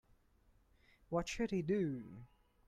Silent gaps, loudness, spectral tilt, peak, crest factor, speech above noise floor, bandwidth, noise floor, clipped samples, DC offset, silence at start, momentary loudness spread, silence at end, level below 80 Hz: none; -39 LUFS; -6 dB/octave; -26 dBFS; 16 dB; 33 dB; 14.5 kHz; -71 dBFS; under 0.1%; under 0.1%; 1.1 s; 16 LU; 0.4 s; -62 dBFS